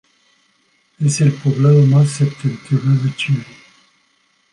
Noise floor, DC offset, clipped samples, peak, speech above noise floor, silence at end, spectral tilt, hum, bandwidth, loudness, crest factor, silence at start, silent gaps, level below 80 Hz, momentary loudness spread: -60 dBFS; under 0.1%; under 0.1%; -4 dBFS; 46 dB; 1.1 s; -6.5 dB/octave; none; 11 kHz; -16 LUFS; 14 dB; 1 s; none; -60 dBFS; 9 LU